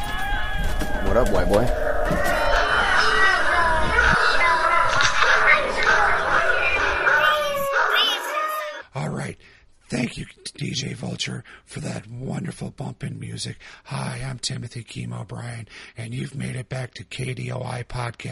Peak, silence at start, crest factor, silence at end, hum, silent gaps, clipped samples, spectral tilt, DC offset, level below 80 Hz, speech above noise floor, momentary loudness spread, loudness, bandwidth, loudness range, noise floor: -2 dBFS; 0 s; 20 dB; 0 s; none; none; under 0.1%; -4 dB/octave; under 0.1%; -32 dBFS; 26 dB; 16 LU; -21 LUFS; 15.5 kHz; 14 LU; -51 dBFS